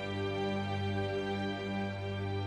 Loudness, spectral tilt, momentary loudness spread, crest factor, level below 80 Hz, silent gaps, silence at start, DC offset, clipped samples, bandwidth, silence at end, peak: -36 LUFS; -7 dB/octave; 2 LU; 12 dB; -62 dBFS; none; 0 s; under 0.1%; under 0.1%; 10 kHz; 0 s; -24 dBFS